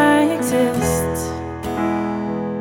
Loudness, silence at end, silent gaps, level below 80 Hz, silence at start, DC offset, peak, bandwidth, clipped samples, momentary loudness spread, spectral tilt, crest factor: -20 LUFS; 0 s; none; -40 dBFS; 0 s; under 0.1%; -4 dBFS; 19 kHz; under 0.1%; 9 LU; -5 dB/octave; 14 dB